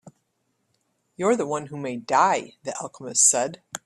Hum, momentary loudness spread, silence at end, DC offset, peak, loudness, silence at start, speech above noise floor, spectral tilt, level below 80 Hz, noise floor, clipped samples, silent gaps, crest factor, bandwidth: none; 16 LU; 0.1 s; under 0.1%; -4 dBFS; -22 LUFS; 0.05 s; 50 dB; -2.5 dB/octave; -70 dBFS; -73 dBFS; under 0.1%; none; 22 dB; 14.5 kHz